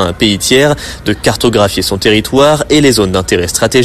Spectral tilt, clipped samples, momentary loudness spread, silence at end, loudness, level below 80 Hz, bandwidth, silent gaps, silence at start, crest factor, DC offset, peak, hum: -4 dB/octave; under 0.1%; 5 LU; 0 s; -10 LUFS; -32 dBFS; 14 kHz; none; 0 s; 10 dB; under 0.1%; 0 dBFS; none